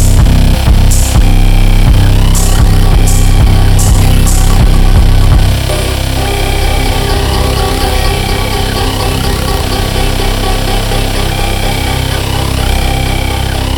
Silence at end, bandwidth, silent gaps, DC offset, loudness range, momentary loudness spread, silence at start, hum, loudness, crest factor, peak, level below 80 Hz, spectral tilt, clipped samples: 0 s; 19 kHz; none; under 0.1%; 4 LU; 4 LU; 0 s; none; -11 LUFS; 8 dB; 0 dBFS; -10 dBFS; -4.5 dB/octave; 0.2%